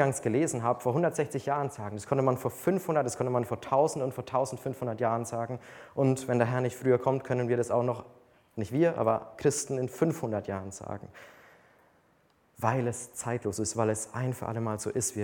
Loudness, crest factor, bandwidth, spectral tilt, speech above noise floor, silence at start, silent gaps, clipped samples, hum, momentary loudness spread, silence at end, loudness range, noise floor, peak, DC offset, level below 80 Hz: -30 LUFS; 20 dB; 19 kHz; -6 dB/octave; 37 dB; 0 s; none; under 0.1%; none; 10 LU; 0 s; 5 LU; -67 dBFS; -10 dBFS; under 0.1%; -66 dBFS